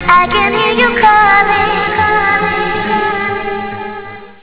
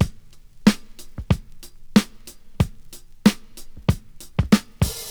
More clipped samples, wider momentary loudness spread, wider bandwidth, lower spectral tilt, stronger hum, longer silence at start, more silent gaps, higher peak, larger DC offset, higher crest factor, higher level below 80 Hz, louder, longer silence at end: neither; about the same, 14 LU vs 14 LU; second, 4 kHz vs over 20 kHz; first, -7.5 dB/octave vs -5.5 dB/octave; neither; about the same, 0 s vs 0 s; neither; about the same, 0 dBFS vs -2 dBFS; first, 0.9% vs 0.2%; second, 10 dB vs 22 dB; about the same, -36 dBFS vs -36 dBFS; first, -11 LUFS vs -23 LUFS; about the same, 0.1 s vs 0 s